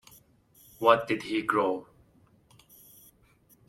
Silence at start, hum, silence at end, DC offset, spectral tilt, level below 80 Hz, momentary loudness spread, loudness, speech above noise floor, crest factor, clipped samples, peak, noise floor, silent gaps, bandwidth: 0.8 s; none; 1.85 s; under 0.1%; -5 dB/octave; -68 dBFS; 7 LU; -27 LUFS; 37 dB; 24 dB; under 0.1%; -6 dBFS; -63 dBFS; none; 16.5 kHz